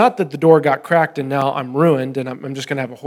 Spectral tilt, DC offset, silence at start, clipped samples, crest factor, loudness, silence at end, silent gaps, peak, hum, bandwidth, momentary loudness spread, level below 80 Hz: -7 dB/octave; under 0.1%; 0 s; under 0.1%; 16 dB; -17 LUFS; 0 s; none; 0 dBFS; none; 14 kHz; 11 LU; -72 dBFS